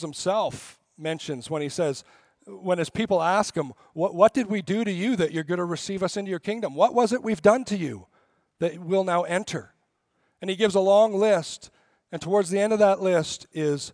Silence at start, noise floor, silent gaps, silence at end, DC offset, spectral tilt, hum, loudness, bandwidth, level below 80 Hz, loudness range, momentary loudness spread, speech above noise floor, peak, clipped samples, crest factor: 0 s; -72 dBFS; none; 0 s; under 0.1%; -5 dB/octave; none; -24 LUFS; 10.5 kHz; -64 dBFS; 5 LU; 14 LU; 48 dB; -4 dBFS; under 0.1%; 20 dB